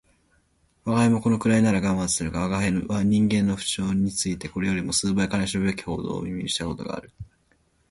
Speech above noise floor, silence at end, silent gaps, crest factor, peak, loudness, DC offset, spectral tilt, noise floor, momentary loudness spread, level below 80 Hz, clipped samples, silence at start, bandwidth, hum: 41 dB; 0.65 s; none; 16 dB; -8 dBFS; -24 LUFS; under 0.1%; -5 dB/octave; -65 dBFS; 9 LU; -46 dBFS; under 0.1%; 0.85 s; 11.5 kHz; none